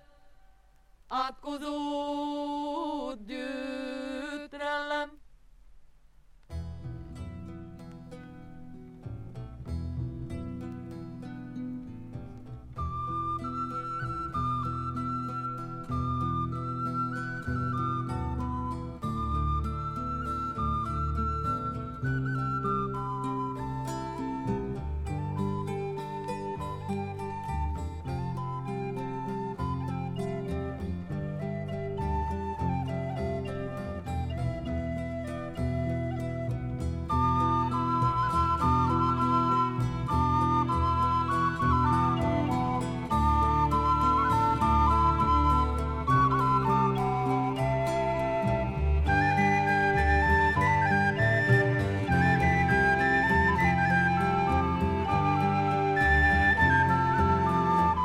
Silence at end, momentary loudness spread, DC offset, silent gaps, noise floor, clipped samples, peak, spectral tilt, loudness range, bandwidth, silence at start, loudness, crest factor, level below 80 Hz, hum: 0 s; 15 LU; under 0.1%; none; -59 dBFS; under 0.1%; -12 dBFS; -7 dB/octave; 14 LU; 13 kHz; 0.25 s; -28 LUFS; 18 dB; -38 dBFS; none